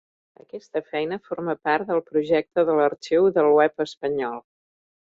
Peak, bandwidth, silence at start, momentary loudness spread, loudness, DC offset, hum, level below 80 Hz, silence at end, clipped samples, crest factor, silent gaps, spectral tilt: -6 dBFS; 7.6 kHz; 0.55 s; 13 LU; -23 LUFS; under 0.1%; none; -66 dBFS; 0.65 s; under 0.1%; 16 dB; 3.97-4.01 s; -6.5 dB/octave